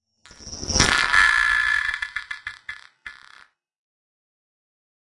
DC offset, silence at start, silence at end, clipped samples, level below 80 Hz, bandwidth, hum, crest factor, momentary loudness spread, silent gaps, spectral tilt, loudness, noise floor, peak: under 0.1%; 0.4 s; 1.9 s; under 0.1%; -42 dBFS; 11.5 kHz; none; 24 dB; 23 LU; none; -1.5 dB/octave; -19 LUFS; -53 dBFS; 0 dBFS